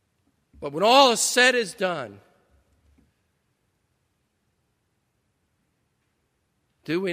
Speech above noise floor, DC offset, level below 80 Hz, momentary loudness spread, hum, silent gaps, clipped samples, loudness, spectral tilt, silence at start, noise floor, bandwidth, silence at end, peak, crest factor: 52 dB; under 0.1%; -68 dBFS; 18 LU; none; none; under 0.1%; -20 LUFS; -2 dB/octave; 0.6 s; -73 dBFS; 15.5 kHz; 0 s; -2 dBFS; 26 dB